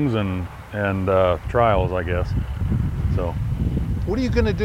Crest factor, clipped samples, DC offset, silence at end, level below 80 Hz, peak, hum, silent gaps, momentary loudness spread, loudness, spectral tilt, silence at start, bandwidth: 18 dB; under 0.1%; under 0.1%; 0 s; -28 dBFS; -4 dBFS; none; none; 7 LU; -22 LUFS; -8 dB/octave; 0 s; 13.5 kHz